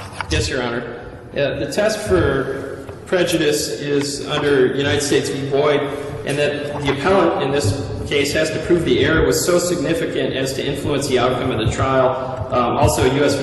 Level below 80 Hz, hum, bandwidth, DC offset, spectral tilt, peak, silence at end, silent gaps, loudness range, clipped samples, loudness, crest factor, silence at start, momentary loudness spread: -36 dBFS; none; 12.5 kHz; under 0.1%; -4.5 dB/octave; -2 dBFS; 0 s; none; 2 LU; under 0.1%; -18 LUFS; 16 dB; 0 s; 8 LU